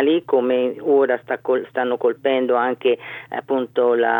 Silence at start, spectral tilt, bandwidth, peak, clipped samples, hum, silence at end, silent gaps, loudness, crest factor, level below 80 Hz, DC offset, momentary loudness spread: 0 s; -7.5 dB/octave; 19.5 kHz; -6 dBFS; under 0.1%; none; 0 s; none; -20 LUFS; 14 dB; -74 dBFS; under 0.1%; 6 LU